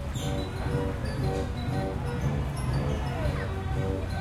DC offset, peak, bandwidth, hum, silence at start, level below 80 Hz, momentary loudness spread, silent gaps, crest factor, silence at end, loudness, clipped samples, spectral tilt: under 0.1%; -16 dBFS; 15 kHz; none; 0 s; -36 dBFS; 2 LU; none; 12 dB; 0 s; -31 LUFS; under 0.1%; -6.5 dB/octave